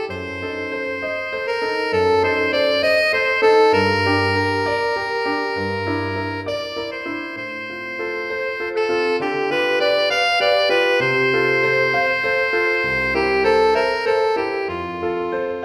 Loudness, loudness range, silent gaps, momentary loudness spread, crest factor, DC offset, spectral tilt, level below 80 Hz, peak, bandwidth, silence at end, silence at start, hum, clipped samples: -19 LUFS; 7 LU; none; 10 LU; 16 dB; under 0.1%; -5 dB/octave; -50 dBFS; -4 dBFS; 13.5 kHz; 0 s; 0 s; none; under 0.1%